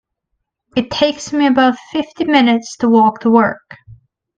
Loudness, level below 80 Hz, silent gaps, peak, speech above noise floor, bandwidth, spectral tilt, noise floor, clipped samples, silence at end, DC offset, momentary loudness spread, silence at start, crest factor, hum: -14 LUFS; -54 dBFS; none; 0 dBFS; 60 dB; 8.8 kHz; -4.5 dB/octave; -73 dBFS; under 0.1%; 0.65 s; under 0.1%; 10 LU; 0.75 s; 16 dB; none